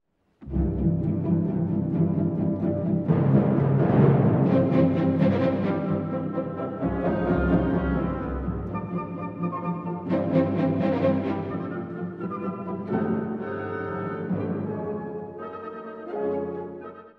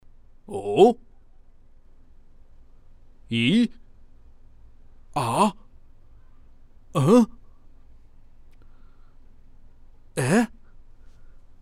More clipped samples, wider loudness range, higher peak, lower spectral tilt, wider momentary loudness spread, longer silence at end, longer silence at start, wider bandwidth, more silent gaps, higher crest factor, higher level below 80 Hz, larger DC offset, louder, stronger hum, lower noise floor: neither; first, 9 LU vs 5 LU; about the same, -6 dBFS vs -4 dBFS; first, -11 dB/octave vs -6 dB/octave; second, 12 LU vs 15 LU; second, 0.1 s vs 0.3 s; about the same, 0.4 s vs 0.5 s; second, 5 kHz vs 15 kHz; neither; about the same, 18 dB vs 22 dB; first, -42 dBFS vs -50 dBFS; neither; second, -25 LUFS vs -22 LUFS; neither; about the same, -46 dBFS vs -49 dBFS